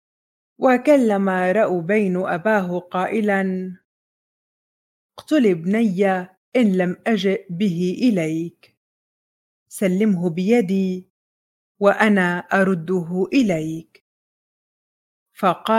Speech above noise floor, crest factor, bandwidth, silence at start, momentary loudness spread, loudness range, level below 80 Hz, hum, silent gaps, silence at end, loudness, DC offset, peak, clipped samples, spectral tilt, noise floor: over 71 dB; 20 dB; 15.5 kHz; 0.6 s; 8 LU; 4 LU; -66 dBFS; none; 3.85-5.10 s, 6.37-6.52 s, 8.77-9.66 s, 11.10-11.75 s, 14.01-15.26 s; 0 s; -20 LUFS; under 0.1%; -2 dBFS; under 0.1%; -7 dB/octave; under -90 dBFS